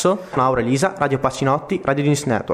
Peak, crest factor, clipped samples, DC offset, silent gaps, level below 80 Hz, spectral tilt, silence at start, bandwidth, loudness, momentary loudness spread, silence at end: -4 dBFS; 16 dB; under 0.1%; under 0.1%; none; -48 dBFS; -5.5 dB/octave; 0 s; 15 kHz; -19 LUFS; 2 LU; 0 s